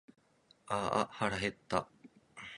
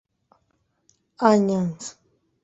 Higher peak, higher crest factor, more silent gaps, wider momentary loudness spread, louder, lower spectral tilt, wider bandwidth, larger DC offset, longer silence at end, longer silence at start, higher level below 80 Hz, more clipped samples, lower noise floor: second, -14 dBFS vs -2 dBFS; about the same, 24 dB vs 22 dB; neither; about the same, 18 LU vs 19 LU; second, -36 LUFS vs -21 LUFS; second, -4.5 dB/octave vs -6.5 dB/octave; first, 11 kHz vs 8.2 kHz; neither; second, 0 s vs 0.55 s; second, 0.65 s vs 1.2 s; about the same, -64 dBFS vs -66 dBFS; neither; about the same, -68 dBFS vs -70 dBFS